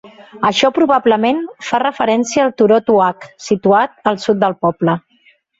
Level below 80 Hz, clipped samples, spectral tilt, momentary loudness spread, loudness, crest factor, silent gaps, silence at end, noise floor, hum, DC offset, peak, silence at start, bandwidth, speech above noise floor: -56 dBFS; under 0.1%; -5 dB/octave; 7 LU; -15 LUFS; 14 dB; none; 0.6 s; -54 dBFS; none; under 0.1%; 0 dBFS; 0.05 s; 8 kHz; 39 dB